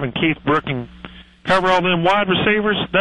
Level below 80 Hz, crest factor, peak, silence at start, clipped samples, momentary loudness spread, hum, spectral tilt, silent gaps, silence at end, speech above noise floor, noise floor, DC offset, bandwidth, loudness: -44 dBFS; 14 dB; -4 dBFS; 0 s; under 0.1%; 12 LU; none; -6 dB/octave; none; 0 s; 22 dB; -39 dBFS; under 0.1%; 11 kHz; -17 LUFS